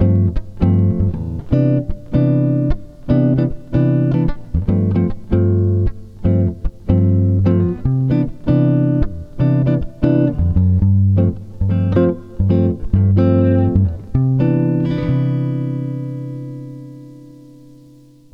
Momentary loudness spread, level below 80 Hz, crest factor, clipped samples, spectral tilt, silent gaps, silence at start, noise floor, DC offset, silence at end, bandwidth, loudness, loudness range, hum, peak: 9 LU; -30 dBFS; 14 dB; under 0.1%; -11.5 dB/octave; none; 0 s; -44 dBFS; under 0.1%; 1.05 s; 4.9 kHz; -17 LUFS; 3 LU; none; -2 dBFS